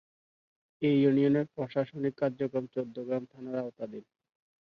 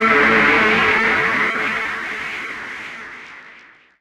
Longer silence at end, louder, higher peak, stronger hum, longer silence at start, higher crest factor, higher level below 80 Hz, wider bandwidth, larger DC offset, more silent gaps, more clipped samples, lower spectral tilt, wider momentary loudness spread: first, 0.65 s vs 0.45 s; second, -31 LUFS vs -16 LUFS; second, -14 dBFS vs -2 dBFS; neither; first, 0.8 s vs 0 s; about the same, 18 dB vs 16 dB; second, -76 dBFS vs -48 dBFS; second, 5.4 kHz vs 15.5 kHz; neither; neither; neither; first, -9.5 dB/octave vs -4 dB/octave; second, 14 LU vs 20 LU